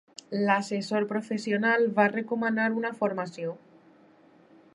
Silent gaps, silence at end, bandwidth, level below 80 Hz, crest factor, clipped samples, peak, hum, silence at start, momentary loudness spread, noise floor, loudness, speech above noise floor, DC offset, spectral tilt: none; 1.15 s; 11 kHz; -82 dBFS; 20 dB; under 0.1%; -8 dBFS; none; 0.3 s; 11 LU; -58 dBFS; -27 LUFS; 31 dB; under 0.1%; -6 dB/octave